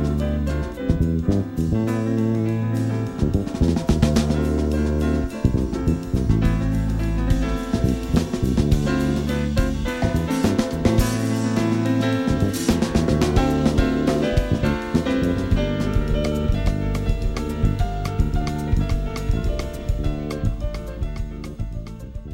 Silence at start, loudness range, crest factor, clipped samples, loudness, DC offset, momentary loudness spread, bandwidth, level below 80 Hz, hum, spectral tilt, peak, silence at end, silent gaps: 0 s; 4 LU; 18 dB; under 0.1%; -22 LUFS; under 0.1%; 6 LU; 16.5 kHz; -26 dBFS; none; -7 dB/octave; -2 dBFS; 0 s; none